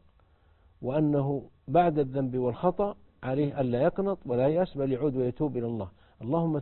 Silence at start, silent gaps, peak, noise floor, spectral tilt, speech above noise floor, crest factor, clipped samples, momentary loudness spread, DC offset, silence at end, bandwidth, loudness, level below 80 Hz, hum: 0.8 s; none; -10 dBFS; -62 dBFS; -12.5 dB/octave; 35 dB; 18 dB; under 0.1%; 9 LU; under 0.1%; 0 s; 4.3 kHz; -29 LUFS; -56 dBFS; none